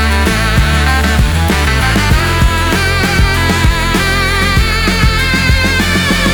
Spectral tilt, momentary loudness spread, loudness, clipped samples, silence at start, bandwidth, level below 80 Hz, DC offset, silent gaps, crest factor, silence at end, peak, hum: -4.5 dB/octave; 1 LU; -11 LUFS; under 0.1%; 0 s; over 20 kHz; -16 dBFS; under 0.1%; none; 10 dB; 0 s; 0 dBFS; none